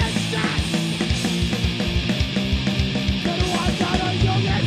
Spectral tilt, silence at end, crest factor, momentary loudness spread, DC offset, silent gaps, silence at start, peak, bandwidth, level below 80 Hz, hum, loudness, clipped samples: -5 dB/octave; 0 s; 14 dB; 2 LU; under 0.1%; none; 0 s; -6 dBFS; 15.5 kHz; -30 dBFS; none; -22 LUFS; under 0.1%